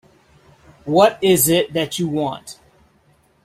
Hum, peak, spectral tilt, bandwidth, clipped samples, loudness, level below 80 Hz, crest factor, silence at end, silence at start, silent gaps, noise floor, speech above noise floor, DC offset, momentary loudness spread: none; -2 dBFS; -4 dB/octave; 16 kHz; under 0.1%; -17 LUFS; -54 dBFS; 18 dB; 0.9 s; 0.85 s; none; -57 dBFS; 40 dB; under 0.1%; 20 LU